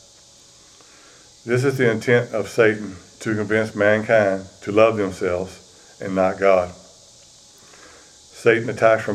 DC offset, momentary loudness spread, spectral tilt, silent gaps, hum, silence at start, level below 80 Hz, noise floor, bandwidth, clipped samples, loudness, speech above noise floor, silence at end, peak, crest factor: under 0.1%; 12 LU; -6 dB/octave; none; none; 1.45 s; -58 dBFS; -49 dBFS; 13.5 kHz; under 0.1%; -20 LUFS; 30 dB; 0 s; 0 dBFS; 20 dB